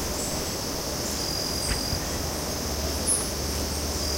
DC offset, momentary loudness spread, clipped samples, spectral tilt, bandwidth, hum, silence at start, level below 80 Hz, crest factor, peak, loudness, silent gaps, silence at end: under 0.1%; 5 LU; under 0.1%; -3 dB/octave; 16 kHz; none; 0 s; -36 dBFS; 16 dB; -12 dBFS; -27 LUFS; none; 0 s